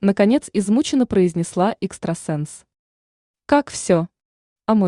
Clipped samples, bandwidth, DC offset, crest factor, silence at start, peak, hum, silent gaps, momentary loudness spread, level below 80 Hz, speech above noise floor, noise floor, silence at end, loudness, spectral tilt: under 0.1%; 11 kHz; under 0.1%; 16 dB; 0 s; -4 dBFS; none; 2.79-3.34 s, 4.25-4.56 s; 10 LU; -54 dBFS; over 71 dB; under -90 dBFS; 0 s; -20 LUFS; -6 dB/octave